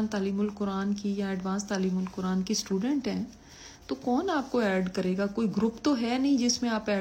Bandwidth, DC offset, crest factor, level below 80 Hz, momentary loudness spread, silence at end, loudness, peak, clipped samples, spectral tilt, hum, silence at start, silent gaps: 16 kHz; under 0.1%; 14 dB; -58 dBFS; 8 LU; 0 s; -29 LUFS; -14 dBFS; under 0.1%; -5 dB/octave; none; 0 s; none